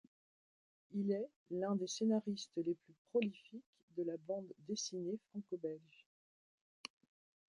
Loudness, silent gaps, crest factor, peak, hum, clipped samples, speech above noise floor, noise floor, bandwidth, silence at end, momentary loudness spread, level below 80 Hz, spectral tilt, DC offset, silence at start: -42 LUFS; 1.36-1.46 s, 2.98-3.05 s, 3.66-3.73 s, 3.83-3.88 s; 18 dB; -24 dBFS; none; under 0.1%; over 49 dB; under -90 dBFS; 11 kHz; 1.75 s; 16 LU; -88 dBFS; -5 dB/octave; under 0.1%; 0.9 s